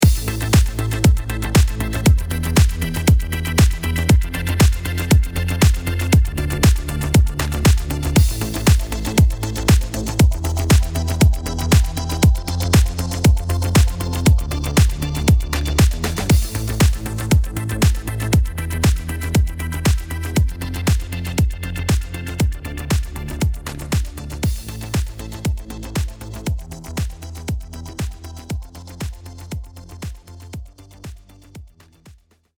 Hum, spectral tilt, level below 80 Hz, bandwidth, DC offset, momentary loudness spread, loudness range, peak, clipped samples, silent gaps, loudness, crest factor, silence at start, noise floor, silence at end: none; -5.5 dB/octave; -22 dBFS; over 20 kHz; under 0.1%; 13 LU; 12 LU; -2 dBFS; under 0.1%; none; -19 LUFS; 16 dB; 0 s; -48 dBFS; 0.45 s